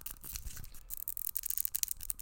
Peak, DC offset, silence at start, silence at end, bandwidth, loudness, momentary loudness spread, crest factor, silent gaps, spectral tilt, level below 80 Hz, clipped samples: -8 dBFS; under 0.1%; 0 s; 0 s; 17.5 kHz; -36 LUFS; 12 LU; 32 dB; none; 0 dB/octave; -52 dBFS; under 0.1%